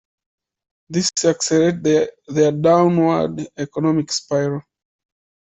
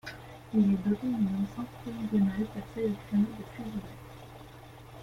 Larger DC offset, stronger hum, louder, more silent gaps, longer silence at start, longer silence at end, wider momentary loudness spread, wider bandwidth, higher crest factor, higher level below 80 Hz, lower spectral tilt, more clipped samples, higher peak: neither; neither; first, -18 LUFS vs -31 LUFS; neither; first, 0.9 s vs 0.05 s; first, 0.8 s vs 0 s; second, 10 LU vs 21 LU; second, 8.4 kHz vs 14 kHz; about the same, 16 dB vs 16 dB; about the same, -58 dBFS vs -56 dBFS; second, -5 dB/octave vs -8 dB/octave; neither; first, -4 dBFS vs -16 dBFS